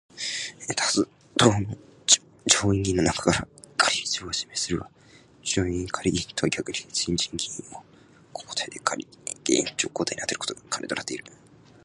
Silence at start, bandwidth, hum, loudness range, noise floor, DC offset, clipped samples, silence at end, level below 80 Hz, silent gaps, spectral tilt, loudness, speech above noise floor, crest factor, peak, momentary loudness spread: 0.15 s; 11.5 kHz; none; 6 LU; -53 dBFS; under 0.1%; under 0.1%; 0.55 s; -48 dBFS; none; -3 dB/octave; -25 LUFS; 26 dB; 26 dB; -2 dBFS; 13 LU